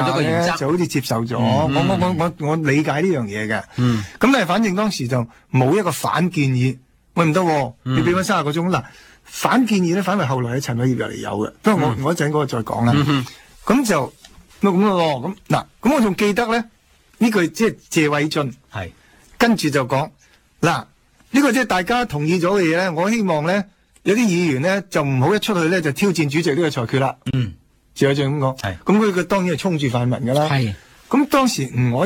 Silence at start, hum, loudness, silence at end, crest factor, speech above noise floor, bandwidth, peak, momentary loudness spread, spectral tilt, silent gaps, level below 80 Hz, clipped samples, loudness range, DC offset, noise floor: 0 s; none; -19 LUFS; 0 s; 18 dB; 31 dB; 18 kHz; 0 dBFS; 7 LU; -6 dB/octave; none; -50 dBFS; under 0.1%; 2 LU; under 0.1%; -49 dBFS